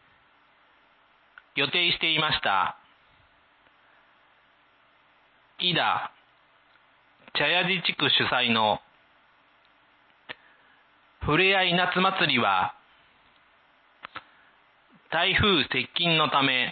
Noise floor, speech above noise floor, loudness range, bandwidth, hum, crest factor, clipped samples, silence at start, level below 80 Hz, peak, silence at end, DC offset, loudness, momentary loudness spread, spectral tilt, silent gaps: -62 dBFS; 38 dB; 7 LU; 4.8 kHz; none; 18 dB; under 0.1%; 1.55 s; -54 dBFS; -10 dBFS; 0 s; under 0.1%; -23 LUFS; 18 LU; -8.5 dB/octave; none